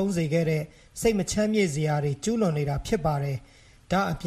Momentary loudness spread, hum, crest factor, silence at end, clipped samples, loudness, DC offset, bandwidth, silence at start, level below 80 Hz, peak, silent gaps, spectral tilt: 6 LU; none; 16 dB; 0 s; under 0.1%; -26 LUFS; under 0.1%; 15 kHz; 0 s; -46 dBFS; -10 dBFS; none; -6 dB/octave